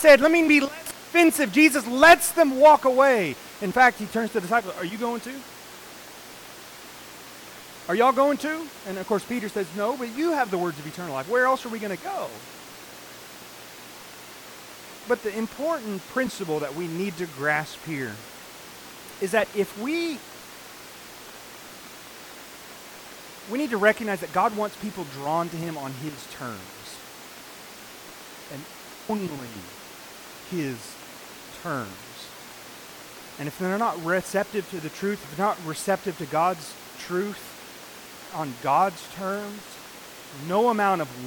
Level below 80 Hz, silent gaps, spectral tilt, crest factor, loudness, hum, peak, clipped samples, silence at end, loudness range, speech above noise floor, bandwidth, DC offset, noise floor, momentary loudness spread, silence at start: -62 dBFS; none; -4 dB/octave; 20 dB; -24 LUFS; none; -6 dBFS; under 0.1%; 0 s; 17 LU; 20 dB; 19 kHz; under 0.1%; -43 dBFS; 22 LU; 0 s